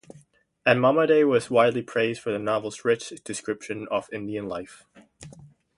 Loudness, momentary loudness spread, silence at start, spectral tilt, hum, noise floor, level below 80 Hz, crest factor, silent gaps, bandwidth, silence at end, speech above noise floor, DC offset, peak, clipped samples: -24 LUFS; 14 LU; 0.65 s; -5 dB/octave; none; -58 dBFS; -64 dBFS; 22 dB; none; 11.5 kHz; 0.3 s; 34 dB; under 0.1%; -4 dBFS; under 0.1%